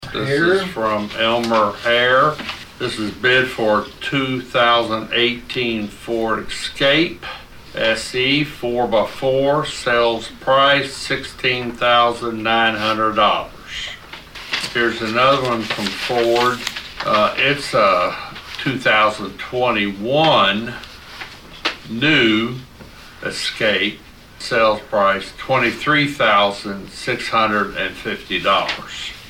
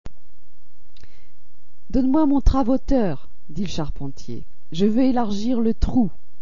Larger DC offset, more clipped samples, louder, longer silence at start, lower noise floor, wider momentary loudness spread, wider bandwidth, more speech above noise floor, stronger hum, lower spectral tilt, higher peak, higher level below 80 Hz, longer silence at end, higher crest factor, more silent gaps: second, under 0.1% vs 9%; neither; first, -17 LUFS vs -22 LUFS; about the same, 0 s vs 0.05 s; second, -40 dBFS vs -58 dBFS; second, 13 LU vs 17 LU; first, 17 kHz vs 7.4 kHz; second, 22 dB vs 38 dB; second, none vs 50 Hz at -50 dBFS; second, -4 dB/octave vs -7.5 dB/octave; about the same, -4 dBFS vs -4 dBFS; second, -46 dBFS vs -30 dBFS; second, 0 s vs 0.3 s; second, 14 dB vs 20 dB; neither